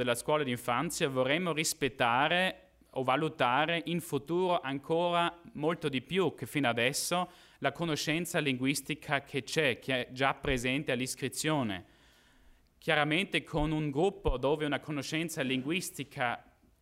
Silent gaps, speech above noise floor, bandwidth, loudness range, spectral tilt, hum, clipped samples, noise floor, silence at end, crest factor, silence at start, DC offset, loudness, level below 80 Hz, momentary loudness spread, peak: none; 31 dB; 16 kHz; 3 LU; -4 dB/octave; none; under 0.1%; -62 dBFS; 0.4 s; 20 dB; 0 s; under 0.1%; -31 LUFS; -52 dBFS; 6 LU; -12 dBFS